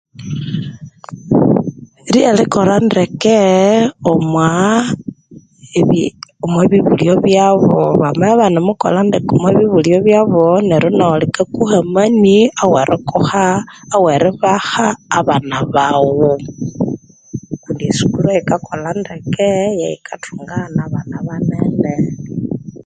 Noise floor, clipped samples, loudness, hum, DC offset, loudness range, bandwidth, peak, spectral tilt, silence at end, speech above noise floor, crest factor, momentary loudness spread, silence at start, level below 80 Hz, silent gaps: -41 dBFS; under 0.1%; -13 LUFS; none; under 0.1%; 6 LU; 9.4 kHz; 0 dBFS; -6.5 dB/octave; 0.1 s; 28 dB; 12 dB; 13 LU; 0.2 s; -46 dBFS; none